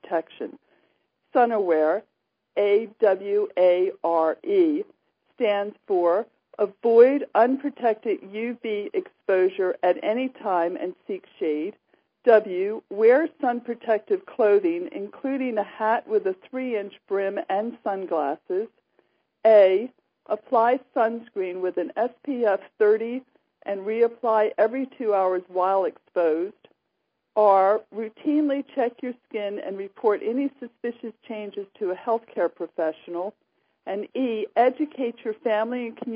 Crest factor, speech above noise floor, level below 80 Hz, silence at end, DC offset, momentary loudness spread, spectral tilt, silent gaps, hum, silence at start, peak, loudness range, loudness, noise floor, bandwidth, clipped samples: 20 dB; 54 dB; -86 dBFS; 0 s; under 0.1%; 13 LU; -9.5 dB/octave; none; none; 0.1 s; -4 dBFS; 6 LU; -24 LUFS; -77 dBFS; 5.2 kHz; under 0.1%